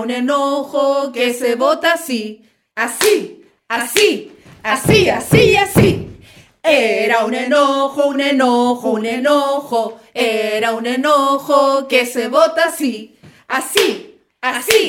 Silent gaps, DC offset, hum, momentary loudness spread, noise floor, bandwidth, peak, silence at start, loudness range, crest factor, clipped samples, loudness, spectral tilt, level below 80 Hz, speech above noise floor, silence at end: none; under 0.1%; none; 10 LU; -43 dBFS; 17 kHz; 0 dBFS; 0 s; 3 LU; 16 dB; under 0.1%; -15 LUFS; -4 dB/octave; -44 dBFS; 29 dB; 0 s